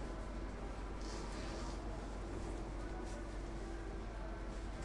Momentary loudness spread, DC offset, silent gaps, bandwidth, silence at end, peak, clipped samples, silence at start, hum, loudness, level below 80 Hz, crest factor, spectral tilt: 2 LU; under 0.1%; none; 11 kHz; 0 s; -32 dBFS; under 0.1%; 0 s; none; -47 LUFS; -46 dBFS; 12 dB; -5.5 dB/octave